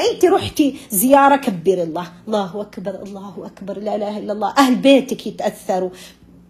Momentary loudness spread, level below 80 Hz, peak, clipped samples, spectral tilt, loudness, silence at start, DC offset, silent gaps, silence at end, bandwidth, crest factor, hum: 17 LU; -54 dBFS; 0 dBFS; under 0.1%; -4.5 dB/octave; -17 LUFS; 0 s; under 0.1%; none; 0.4 s; 14 kHz; 18 dB; none